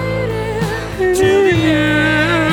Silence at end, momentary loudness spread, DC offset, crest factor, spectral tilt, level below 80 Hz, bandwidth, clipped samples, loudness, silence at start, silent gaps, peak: 0 s; 7 LU; under 0.1%; 12 dB; -5.5 dB/octave; -32 dBFS; 18 kHz; under 0.1%; -14 LUFS; 0 s; none; -2 dBFS